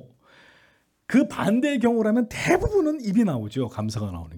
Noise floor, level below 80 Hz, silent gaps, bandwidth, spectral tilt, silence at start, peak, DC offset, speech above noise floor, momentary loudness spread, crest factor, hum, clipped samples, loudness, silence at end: -62 dBFS; -46 dBFS; none; 17.5 kHz; -6.5 dB/octave; 1.1 s; -6 dBFS; under 0.1%; 39 dB; 8 LU; 18 dB; none; under 0.1%; -23 LUFS; 0 s